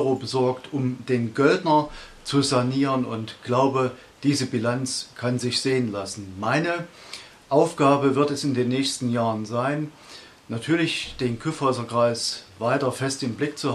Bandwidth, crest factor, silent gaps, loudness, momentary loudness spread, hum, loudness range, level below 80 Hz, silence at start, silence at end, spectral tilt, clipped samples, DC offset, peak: 13 kHz; 20 dB; none; -24 LUFS; 12 LU; none; 3 LU; -56 dBFS; 0 s; 0 s; -5 dB/octave; under 0.1%; under 0.1%; -4 dBFS